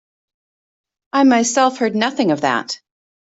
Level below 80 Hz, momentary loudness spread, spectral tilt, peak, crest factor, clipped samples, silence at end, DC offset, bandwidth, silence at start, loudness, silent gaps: -66 dBFS; 9 LU; -3.5 dB/octave; -2 dBFS; 16 dB; under 0.1%; 0.45 s; under 0.1%; 8 kHz; 1.15 s; -16 LUFS; none